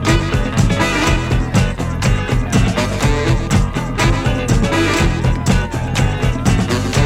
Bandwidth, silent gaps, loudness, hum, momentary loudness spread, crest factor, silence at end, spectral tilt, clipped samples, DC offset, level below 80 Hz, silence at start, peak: 15.5 kHz; none; -16 LUFS; none; 3 LU; 14 dB; 0 s; -5.5 dB/octave; under 0.1%; under 0.1%; -22 dBFS; 0 s; 0 dBFS